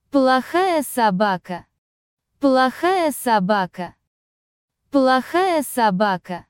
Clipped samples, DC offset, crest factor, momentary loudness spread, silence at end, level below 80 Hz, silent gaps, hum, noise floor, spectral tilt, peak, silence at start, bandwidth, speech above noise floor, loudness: under 0.1%; under 0.1%; 16 dB; 10 LU; 0.1 s; -62 dBFS; 1.78-2.17 s, 4.07-4.68 s; none; under -90 dBFS; -5 dB/octave; -4 dBFS; 0.15 s; 17 kHz; over 71 dB; -19 LUFS